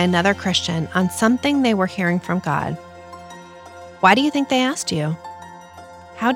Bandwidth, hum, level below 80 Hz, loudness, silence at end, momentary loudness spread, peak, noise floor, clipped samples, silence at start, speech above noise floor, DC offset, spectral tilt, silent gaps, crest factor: 16.5 kHz; none; -58 dBFS; -19 LUFS; 0 s; 22 LU; -2 dBFS; -40 dBFS; under 0.1%; 0 s; 22 dB; under 0.1%; -4.5 dB/octave; none; 20 dB